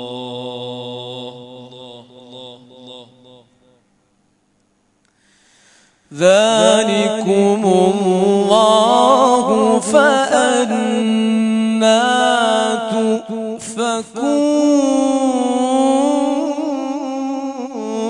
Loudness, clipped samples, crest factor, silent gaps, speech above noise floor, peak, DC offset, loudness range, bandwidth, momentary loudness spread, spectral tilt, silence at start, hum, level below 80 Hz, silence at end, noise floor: -15 LUFS; under 0.1%; 16 dB; none; 48 dB; 0 dBFS; under 0.1%; 8 LU; 11 kHz; 16 LU; -4 dB/octave; 0 s; none; -62 dBFS; 0 s; -61 dBFS